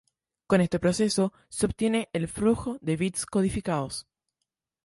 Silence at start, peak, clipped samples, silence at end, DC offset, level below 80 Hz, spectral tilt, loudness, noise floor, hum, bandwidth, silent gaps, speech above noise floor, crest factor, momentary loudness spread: 0.5 s; -8 dBFS; under 0.1%; 0.85 s; under 0.1%; -50 dBFS; -5.5 dB/octave; -27 LUFS; -84 dBFS; none; 11.5 kHz; none; 58 dB; 20 dB; 6 LU